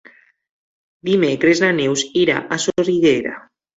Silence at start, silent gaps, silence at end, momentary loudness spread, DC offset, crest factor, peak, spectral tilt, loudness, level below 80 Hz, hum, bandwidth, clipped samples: 1.05 s; none; 0.4 s; 9 LU; under 0.1%; 16 dB; -2 dBFS; -4.5 dB/octave; -17 LUFS; -56 dBFS; none; 8 kHz; under 0.1%